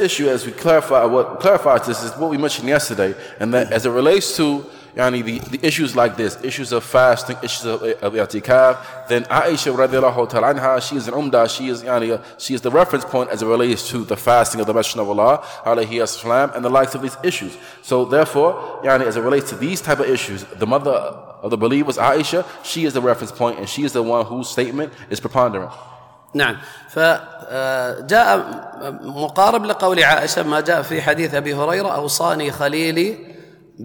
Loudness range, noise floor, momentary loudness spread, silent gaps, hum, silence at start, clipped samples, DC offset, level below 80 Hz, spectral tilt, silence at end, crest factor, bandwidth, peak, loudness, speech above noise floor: 3 LU; -40 dBFS; 10 LU; none; none; 0 s; under 0.1%; under 0.1%; -56 dBFS; -4 dB/octave; 0 s; 16 dB; 19 kHz; -2 dBFS; -18 LUFS; 22 dB